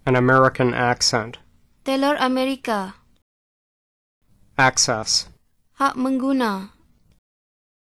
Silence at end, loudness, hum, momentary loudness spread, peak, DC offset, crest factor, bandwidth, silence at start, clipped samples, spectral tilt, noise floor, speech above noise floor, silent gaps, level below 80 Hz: 1.2 s; -20 LUFS; none; 14 LU; -4 dBFS; under 0.1%; 18 dB; 12.5 kHz; 0.05 s; under 0.1%; -3.5 dB/octave; under -90 dBFS; over 70 dB; 3.22-4.21 s; -52 dBFS